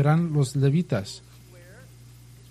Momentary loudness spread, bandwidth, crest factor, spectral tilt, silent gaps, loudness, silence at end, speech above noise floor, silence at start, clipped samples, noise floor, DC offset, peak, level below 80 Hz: 16 LU; 12.5 kHz; 18 dB; -7 dB/octave; none; -24 LUFS; 1.3 s; 25 dB; 0 s; under 0.1%; -48 dBFS; under 0.1%; -8 dBFS; -56 dBFS